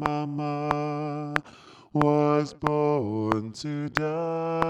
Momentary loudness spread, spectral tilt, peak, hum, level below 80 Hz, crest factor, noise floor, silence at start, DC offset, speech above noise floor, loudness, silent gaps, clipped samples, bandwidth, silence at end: 8 LU; -7 dB/octave; -2 dBFS; none; -56 dBFS; 26 dB; -50 dBFS; 0 s; under 0.1%; 22 dB; -27 LUFS; none; under 0.1%; 10.5 kHz; 0 s